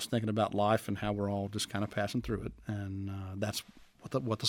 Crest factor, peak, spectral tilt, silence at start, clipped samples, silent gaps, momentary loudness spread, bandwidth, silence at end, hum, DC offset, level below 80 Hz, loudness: 20 dB; -14 dBFS; -5.5 dB/octave; 0 s; under 0.1%; none; 10 LU; 18.5 kHz; 0 s; none; under 0.1%; -56 dBFS; -35 LUFS